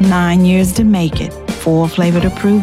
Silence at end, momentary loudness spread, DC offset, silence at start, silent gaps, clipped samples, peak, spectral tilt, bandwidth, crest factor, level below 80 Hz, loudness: 0 s; 9 LU; under 0.1%; 0 s; none; under 0.1%; -4 dBFS; -6.5 dB/octave; 15 kHz; 8 dB; -30 dBFS; -13 LUFS